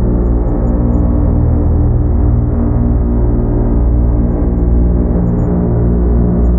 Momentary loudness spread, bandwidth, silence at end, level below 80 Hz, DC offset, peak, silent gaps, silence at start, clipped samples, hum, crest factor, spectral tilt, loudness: 2 LU; 2.2 kHz; 0 s; -14 dBFS; under 0.1%; 0 dBFS; none; 0 s; under 0.1%; 60 Hz at -20 dBFS; 10 dB; -14 dB/octave; -13 LUFS